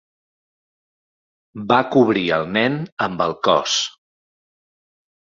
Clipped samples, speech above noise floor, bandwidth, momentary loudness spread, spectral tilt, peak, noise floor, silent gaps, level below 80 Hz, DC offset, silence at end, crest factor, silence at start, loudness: under 0.1%; over 72 dB; 7.8 kHz; 8 LU; -4 dB/octave; 0 dBFS; under -90 dBFS; 2.92-2.97 s; -58 dBFS; under 0.1%; 1.3 s; 22 dB; 1.55 s; -19 LUFS